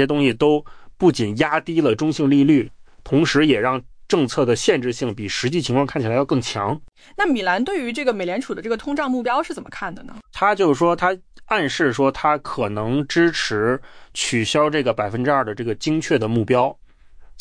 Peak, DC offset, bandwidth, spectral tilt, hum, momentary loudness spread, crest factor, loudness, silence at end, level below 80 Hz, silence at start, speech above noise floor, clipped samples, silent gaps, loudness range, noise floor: -4 dBFS; under 0.1%; 10.5 kHz; -5 dB/octave; none; 9 LU; 14 dB; -20 LUFS; 0 s; -48 dBFS; 0 s; 23 dB; under 0.1%; none; 4 LU; -43 dBFS